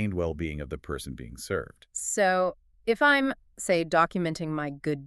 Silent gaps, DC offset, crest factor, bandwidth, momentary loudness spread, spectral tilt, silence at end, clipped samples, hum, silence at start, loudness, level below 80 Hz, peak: none; under 0.1%; 20 dB; 13.5 kHz; 14 LU; -4.5 dB/octave; 0 s; under 0.1%; none; 0 s; -27 LUFS; -48 dBFS; -8 dBFS